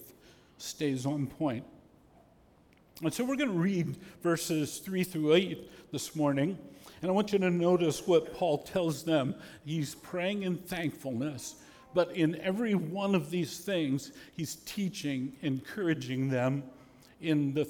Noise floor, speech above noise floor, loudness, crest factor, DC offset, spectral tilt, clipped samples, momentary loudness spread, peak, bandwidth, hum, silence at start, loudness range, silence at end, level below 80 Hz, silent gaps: -62 dBFS; 31 dB; -32 LUFS; 20 dB; under 0.1%; -5.5 dB/octave; under 0.1%; 11 LU; -12 dBFS; 19 kHz; none; 0 s; 5 LU; 0 s; -66 dBFS; none